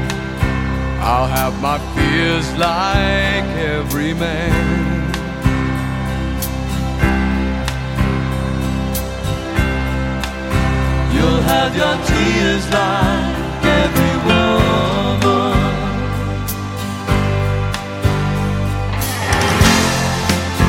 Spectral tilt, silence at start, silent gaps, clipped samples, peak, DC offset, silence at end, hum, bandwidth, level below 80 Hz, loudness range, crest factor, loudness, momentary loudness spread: -5.5 dB/octave; 0 s; none; under 0.1%; 0 dBFS; under 0.1%; 0 s; none; 16.5 kHz; -24 dBFS; 4 LU; 16 dB; -17 LUFS; 7 LU